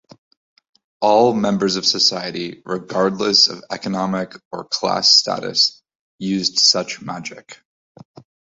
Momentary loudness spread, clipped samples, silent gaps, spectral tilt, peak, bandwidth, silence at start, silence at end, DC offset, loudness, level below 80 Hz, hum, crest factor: 15 LU; under 0.1%; 4.45-4.51 s, 5.95-6.19 s; -3 dB/octave; 0 dBFS; 8 kHz; 1 s; 1 s; under 0.1%; -17 LUFS; -60 dBFS; none; 20 dB